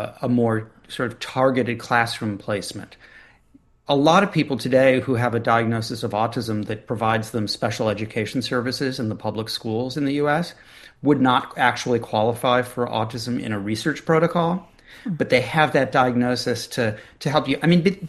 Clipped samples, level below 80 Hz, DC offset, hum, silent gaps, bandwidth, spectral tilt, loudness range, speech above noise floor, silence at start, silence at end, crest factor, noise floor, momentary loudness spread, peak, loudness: under 0.1%; -56 dBFS; under 0.1%; none; none; 12.5 kHz; -5.5 dB/octave; 4 LU; 34 dB; 0 s; 0 s; 20 dB; -56 dBFS; 10 LU; -2 dBFS; -22 LUFS